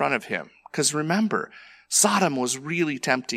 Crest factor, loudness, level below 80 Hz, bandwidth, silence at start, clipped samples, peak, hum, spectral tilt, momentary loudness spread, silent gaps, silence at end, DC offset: 20 dB; -23 LUFS; -72 dBFS; 16 kHz; 0 s; under 0.1%; -4 dBFS; none; -3 dB/octave; 12 LU; none; 0 s; under 0.1%